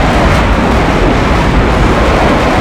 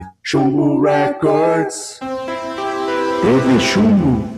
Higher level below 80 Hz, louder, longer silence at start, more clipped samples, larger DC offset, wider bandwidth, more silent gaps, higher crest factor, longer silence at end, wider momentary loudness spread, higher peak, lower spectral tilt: first, -14 dBFS vs -44 dBFS; first, -9 LUFS vs -16 LUFS; about the same, 0 s vs 0 s; neither; neither; about the same, 14 kHz vs 13.5 kHz; neither; second, 8 dB vs 14 dB; about the same, 0 s vs 0 s; second, 1 LU vs 11 LU; about the same, 0 dBFS vs -2 dBFS; about the same, -6 dB/octave vs -6 dB/octave